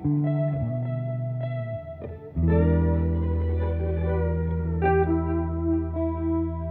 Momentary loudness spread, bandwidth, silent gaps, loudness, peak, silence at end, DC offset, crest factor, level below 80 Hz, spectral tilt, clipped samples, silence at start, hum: 8 LU; 3.7 kHz; none; -26 LUFS; -12 dBFS; 0 s; under 0.1%; 14 dB; -36 dBFS; -13 dB/octave; under 0.1%; 0 s; none